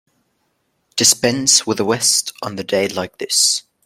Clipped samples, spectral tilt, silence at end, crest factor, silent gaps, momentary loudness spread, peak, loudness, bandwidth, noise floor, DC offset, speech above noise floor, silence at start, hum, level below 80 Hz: under 0.1%; -1.5 dB/octave; 0.25 s; 18 dB; none; 13 LU; 0 dBFS; -15 LUFS; 16.5 kHz; -67 dBFS; under 0.1%; 50 dB; 0.95 s; none; -60 dBFS